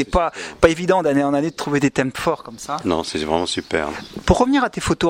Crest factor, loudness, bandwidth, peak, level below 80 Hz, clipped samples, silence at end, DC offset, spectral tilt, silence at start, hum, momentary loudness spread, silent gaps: 20 dB; -20 LUFS; 16 kHz; 0 dBFS; -36 dBFS; under 0.1%; 0 s; under 0.1%; -5 dB/octave; 0 s; none; 8 LU; none